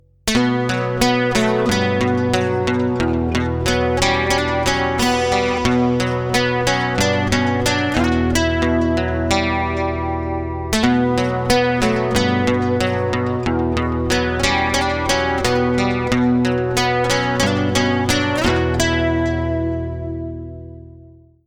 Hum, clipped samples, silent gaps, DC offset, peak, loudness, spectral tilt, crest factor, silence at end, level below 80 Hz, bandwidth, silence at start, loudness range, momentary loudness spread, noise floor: none; under 0.1%; none; under 0.1%; -2 dBFS; -18 LUFS; -5 dB/octave; 16 dB; 0.35 s; -32 dBFS; 19 kHz; 0.25 s; 1 LU; 4 LU; -45 dBFS